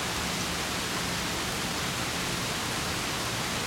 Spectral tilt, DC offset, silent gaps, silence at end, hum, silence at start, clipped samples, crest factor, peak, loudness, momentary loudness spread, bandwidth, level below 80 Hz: -2.5 dB/octave; under 0.1%; none; 0 s; none; 0 s; under 0.1%; 14 dB; -18 dBFS; -29 LUFS; 0 LU; 16.5 kHz; -48 dBFS